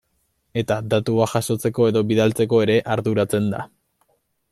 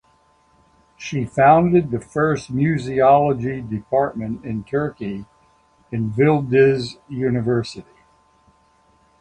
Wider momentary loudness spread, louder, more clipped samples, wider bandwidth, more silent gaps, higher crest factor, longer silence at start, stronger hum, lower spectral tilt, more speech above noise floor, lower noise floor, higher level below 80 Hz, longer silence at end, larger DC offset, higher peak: second, 9 LU vs 15 LU; about the same, -20 LUFS vs -19 LUFS; neither; first, 15.5 kHz vs 10.5 kHz; neither; about the same, 16 dB vs 18 dB; second, 0.55 s vs 1 s; neither; second, -6 dB/octave vs -7.5 dB/octave; first, 49 dB vs 40 dB; first, -69 dBFS vs -58 dBFS; second, -58 dBFS vs -50 dBFS; second, 0.85 s vs 1.4 s; neither; about the same, -4 dBFS vs -2 dBFS